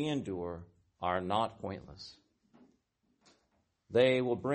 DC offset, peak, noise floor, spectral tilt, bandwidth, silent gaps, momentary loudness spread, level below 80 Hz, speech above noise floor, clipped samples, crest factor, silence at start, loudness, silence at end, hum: under 0.1%; -14 dBFS; -77 dBFS; -6.5 dB/octave; 8.4 kHz; none; 21 LU; -66 dBFS; 44 dB; under 0.1%; 20 dB; 0 s; -33 LUFS; 0 s; none